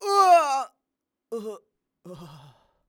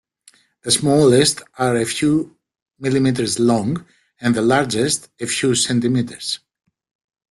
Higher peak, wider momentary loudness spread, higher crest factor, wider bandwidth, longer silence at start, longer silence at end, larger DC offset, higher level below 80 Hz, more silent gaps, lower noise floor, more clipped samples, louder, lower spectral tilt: second, -8 dBFS vs -2 dBFS; first, 27 LU vs 12 LU; about the same, 18 dB vs 16 dB; first, 18.5 kHz vs 12.5 kHz; second, 0 s vs 0.65 s; second, 0.6 s vs 0.95 s; neither; second, -72 dBFS vs -54 dBFS; second, none vs 2.62-2.66 s; first, -85 dBFS vs -54 dBFS; neither; about the same, -20 LUFS vs -18 LUFS; second, -3 dB/octave vs -4.5 dB/octave